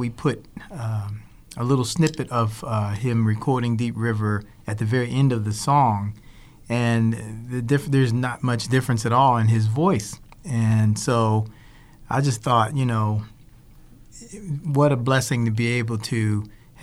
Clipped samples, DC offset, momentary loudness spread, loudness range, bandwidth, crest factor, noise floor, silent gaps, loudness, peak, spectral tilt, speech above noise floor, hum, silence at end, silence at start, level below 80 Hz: under 0.1%; under 0.1%; 13 LU; 3 LU; 13.5 kHz; 16 dB; -47 dBFS; none; -22 LUFS; -6 dBFS; -6.5 dB/octave; 26 dB; none; 0 s; 0 s; -50 dBFS